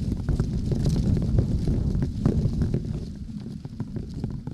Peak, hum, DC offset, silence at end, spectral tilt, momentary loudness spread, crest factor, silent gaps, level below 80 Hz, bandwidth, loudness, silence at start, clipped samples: -8 dBFS; none; under 0.1%; 0 s; -8.5 dB/octave; 12 LU; 18 dB; none; -30 dBFS; 12 kHz; -27 LUFS; 0 s; under 0.1%